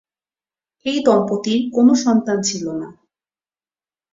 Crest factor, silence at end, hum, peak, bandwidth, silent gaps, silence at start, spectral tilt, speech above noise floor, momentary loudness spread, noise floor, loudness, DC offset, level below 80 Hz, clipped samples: 18 dB; 1.2 s; none; -2 dBFS; 7.8 kHz; none; 0.85 s; -4.5 dB/octave; over 73 dB; 14 LU; under -90 dBFS; -17 LUFS; under 0.1%; -62 dBFS; under 0.1%